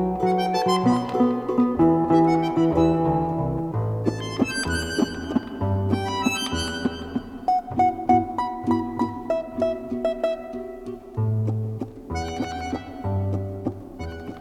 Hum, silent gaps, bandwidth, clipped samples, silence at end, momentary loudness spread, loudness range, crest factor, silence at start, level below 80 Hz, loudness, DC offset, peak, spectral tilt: none; none; 14 kHz; under 0.1%; 0 s; 12 LU; 8 LU; 18 dB; 0 s; -46 dBFS; -24 LUFS; under 0.1%; -6 dBFS; -6.5 dB/octave